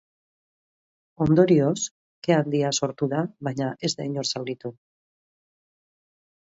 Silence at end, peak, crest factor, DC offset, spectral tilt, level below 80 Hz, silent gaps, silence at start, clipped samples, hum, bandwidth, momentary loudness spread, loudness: 1.8 s; -4 dBFS; 22 dB; under 0.1%; -5.5 dB/octave; -60 dBFS; 1.91-2.22 s; 1.2 s; under 0.1%; none; 8 kHz; 13 LU; -24 LUFS